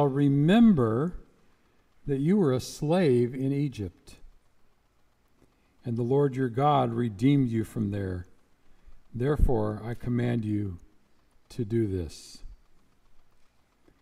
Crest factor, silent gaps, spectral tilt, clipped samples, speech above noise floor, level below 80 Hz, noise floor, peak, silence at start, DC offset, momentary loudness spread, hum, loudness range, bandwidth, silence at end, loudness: 18 dB; none; -8 dB/octave; under 0.1%; 39 dB; -42 dBFS; -65 dBFS; -8 dBFS; 0 s; under 0.1%; 17 LU; none; 7 LU; 14 kHz; 0.8 s; -27 LUFS